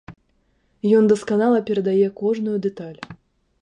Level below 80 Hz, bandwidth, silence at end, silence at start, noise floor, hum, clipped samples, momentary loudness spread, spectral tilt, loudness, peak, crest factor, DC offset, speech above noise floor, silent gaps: -62 dBFS; 10.5 kHz; 0.5 s; 0.1 s; -64 dBFS; none; under 0.1%; 19 LU; -7.5 dB/octave; -20 LUFS; -4 dBFS; 16 dB; under 0.1%; 45 dB; none